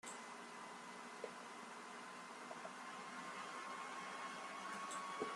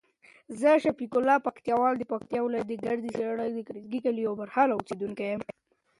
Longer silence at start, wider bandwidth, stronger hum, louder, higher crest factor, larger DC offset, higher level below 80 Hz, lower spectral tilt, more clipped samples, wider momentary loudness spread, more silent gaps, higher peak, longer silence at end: second, 0.05 s vs 0.5 s; first, 13 kHz vs 11.5 kHz; neither; second, -50 LUFS vs -28 LUFS; about the same, 20 dB vs 18 dB; neither; second, under -90 dBFS vs -70 dBFS; second, -2 dB/octave vs -6.5 dB/octave; neither; second, 6 LU vs 11 LU; neither; second, -30 dBFS vs -10 dBFS; second, 0 s vs 0.55 s